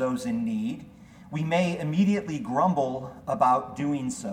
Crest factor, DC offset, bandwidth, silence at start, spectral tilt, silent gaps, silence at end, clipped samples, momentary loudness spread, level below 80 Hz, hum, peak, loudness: 18 dB; under 0.1%; 14.5 kHz; 0 s; -6.5 dB/octave; none; 0 s; under 0.1%; 10 LU; -60 dBFS; none; -8 dBFS; -27 LUFS